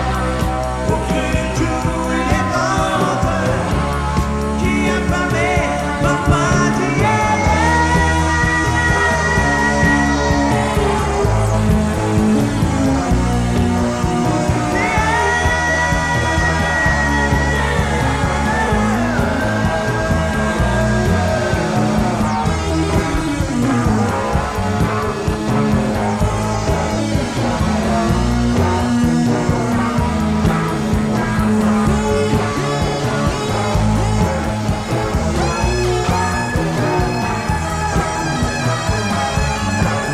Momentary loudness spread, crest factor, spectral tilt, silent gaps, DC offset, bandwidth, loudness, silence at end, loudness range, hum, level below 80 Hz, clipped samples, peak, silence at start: 4 LU; 14 dB; -5.5 dB/octave; none; under 0.1%; 15.5 kHz; -16 LUFS; 0 s; 3 LU; none; -26 dBFS; under 0.1%; -2 dBFS; 0 s